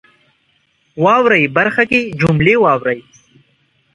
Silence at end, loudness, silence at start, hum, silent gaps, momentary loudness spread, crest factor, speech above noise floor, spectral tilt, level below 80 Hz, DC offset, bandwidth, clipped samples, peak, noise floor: 0.95 s; -13 LUFS; 0.95 s; none; none; 9 LU; 16 dB; 47 dB; -7 dB/octave; -46 dBFS; under 0.1%; 11 kHz; under 0.1%; 0 dBFS; -60 dBFS